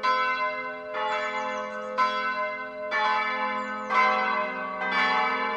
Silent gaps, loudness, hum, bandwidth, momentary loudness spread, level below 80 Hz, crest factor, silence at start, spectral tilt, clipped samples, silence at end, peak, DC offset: none; -26 LUFS; none; 8.8 kHz; 9 LU; -70 dBFS; 16 dB; 0 s; -3 dB/octave; under 0.1%; 0 s; -10 dBFS; under 0.1%